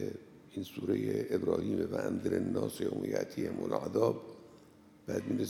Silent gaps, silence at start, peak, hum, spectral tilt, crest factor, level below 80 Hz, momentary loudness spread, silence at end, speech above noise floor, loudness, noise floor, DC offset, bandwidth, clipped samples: none; 0 s; -16 dBFS; none; -7 dB/octave; 20 dB; -72 dBFS; 13 LU; 0 s; 25 dB; -35 LUFS; -59 dBFS; under 0.1%; 17.5 kHz; under 0.1%